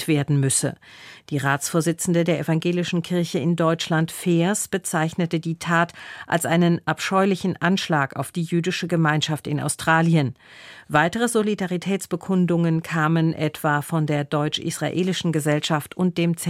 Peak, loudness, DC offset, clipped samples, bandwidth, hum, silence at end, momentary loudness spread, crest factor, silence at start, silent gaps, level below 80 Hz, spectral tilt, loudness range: -2 dBFS; -22 LUFS; under 0.1%; under 0.1%; 15.5 kHz; none; 0 s; 6 LU; 20 dB; 0 s; none; -62 dBFS; -5 dB/octave; 1 LU